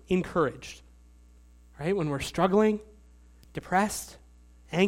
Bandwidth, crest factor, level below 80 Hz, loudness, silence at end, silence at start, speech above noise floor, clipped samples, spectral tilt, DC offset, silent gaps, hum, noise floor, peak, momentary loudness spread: 16.5 kHz; 18 dB; -52 dBFS; -28 LUFS; 0 s; 0.1 s; 27 dB; under 0.1%; -5.5 dB/octave; under 0.1%; none; 60 Hz at -55 dBFS; -55 dBFS; -10 dBFS; 19 LU